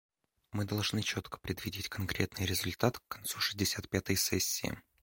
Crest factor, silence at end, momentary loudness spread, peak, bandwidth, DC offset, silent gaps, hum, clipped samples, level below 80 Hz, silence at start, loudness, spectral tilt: 22 dB; 0.25 s; 8 LU; -12 dBFS; 17 kHz; under 0.1%; none; none; under 0.1%; -56 dBFS; 0.55 s; -34 LUFS; -3.5 dB/octave